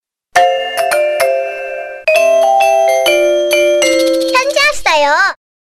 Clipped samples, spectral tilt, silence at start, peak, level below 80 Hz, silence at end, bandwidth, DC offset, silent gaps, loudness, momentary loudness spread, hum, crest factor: under 0.1%; -1 dB/octave; 0.35 s; 0 dBFS; -48 dBFS; 0.3 s; 14 kHz; under 0.1%; none; -11 LUFS; 6 LU; none; 12 dB